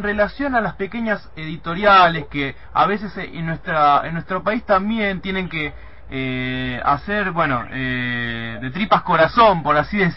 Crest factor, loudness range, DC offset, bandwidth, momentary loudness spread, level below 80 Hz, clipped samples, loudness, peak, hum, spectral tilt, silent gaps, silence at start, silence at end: 16 dB; 4 LU; 1%; 5.8 kHz; 13 LU; -42 dBFS; under 0.1%; -19 LUFS; -2 dBFS; none; -9 dB/octave; none; 0 s; 0 s